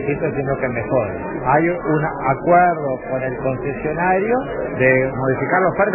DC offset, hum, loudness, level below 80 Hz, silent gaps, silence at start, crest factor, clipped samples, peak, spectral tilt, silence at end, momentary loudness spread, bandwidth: under 0.1%; none; -18 LUFS; -42 dBFS; none; 0 s; 16 dB; under 0.1%; -2 dBFS; -12 dB/octave; 0 s; 8 LU; 3.1 kHz